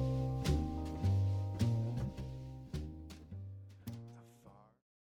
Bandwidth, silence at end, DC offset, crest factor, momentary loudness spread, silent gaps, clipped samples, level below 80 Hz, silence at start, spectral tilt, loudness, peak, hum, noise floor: 14.5 kHz; 0.5 s; under 0.1%; 16 dB; 16 LU; none; under 0.1%; -48 dBFS; 0 s; -7.5 dB/octave; -39 LUFS; -22 dBFS; none; -62 dBFS